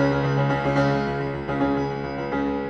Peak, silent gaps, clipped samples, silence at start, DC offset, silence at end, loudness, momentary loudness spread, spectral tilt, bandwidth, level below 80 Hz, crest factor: -8 dBFS; none; under 0.1%; 0 s; 0.2%; 0 s; -24 LUFS; 6 LU; -8 dB/octave; 7 kHz; -44 dBFS; 14 dB